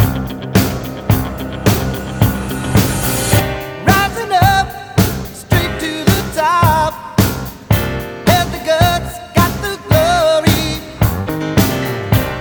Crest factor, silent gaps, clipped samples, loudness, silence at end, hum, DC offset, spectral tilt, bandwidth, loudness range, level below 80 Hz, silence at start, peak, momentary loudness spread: 14 dB; none; under 0.1%; -15 LUFS; 0 s; none; under 0.1%; -5 dB/octave; over 20 kHz; 2 LU; -28 dBFS; 0 s; 0 dBFS; 8 LU